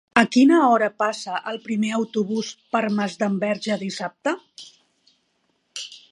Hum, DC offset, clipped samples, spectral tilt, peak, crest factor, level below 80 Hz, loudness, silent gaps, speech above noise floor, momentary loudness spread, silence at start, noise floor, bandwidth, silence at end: none; under 0.1%; under 0.1%; -5 dB/octave; -2 dBFS; 22 dB; -70 dBFS; -22 LUFS; none; 48 dB; 19 LU; 0.15 s; -69 dBFS; 11.5 kHz; 0.15 s